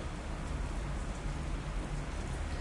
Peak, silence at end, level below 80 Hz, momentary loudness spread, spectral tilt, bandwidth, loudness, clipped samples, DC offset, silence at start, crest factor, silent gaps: -26 dBFS; 0 s; -38 dBFS; 1 LU; -5.5 dB/octave; 11.5 kHz; -40 LUFS; under 0.1%; under 0.1%; 0 s; 12 dB; none